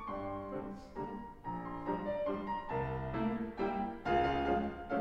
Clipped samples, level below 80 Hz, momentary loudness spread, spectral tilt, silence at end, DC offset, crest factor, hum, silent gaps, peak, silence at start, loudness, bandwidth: under 0.1%; -54 dBFS; 11 LU; -8 dB/octave; 0 s; under 0.1%; 16 dB; none; none; -20 dBFS; 0 s; -38 LUFS; 8 kHz